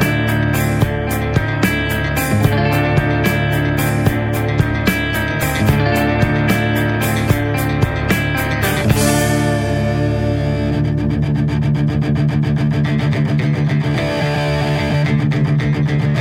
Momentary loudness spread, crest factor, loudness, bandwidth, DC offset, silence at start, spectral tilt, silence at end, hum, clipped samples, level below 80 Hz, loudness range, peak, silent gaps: 3 LU; 14 dB; -16 LUFS; 17 kHz; under 0.1%; 0 s; -6 dB/octave; 0 s; none; under 0.1%; -30 dBFS; 1 LU; 0 dBFS; none